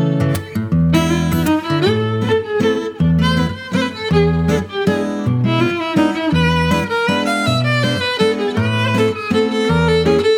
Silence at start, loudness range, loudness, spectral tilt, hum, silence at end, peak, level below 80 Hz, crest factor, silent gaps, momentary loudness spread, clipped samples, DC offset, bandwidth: 0 s; 1 LU; -16 LUFS; -6.5 dB/octave; none; 0 s; -2 dBFS; -36 dBFS; 14 dB; none; 4 LU; under 0.1%; under 0.1%; 17.5 kHz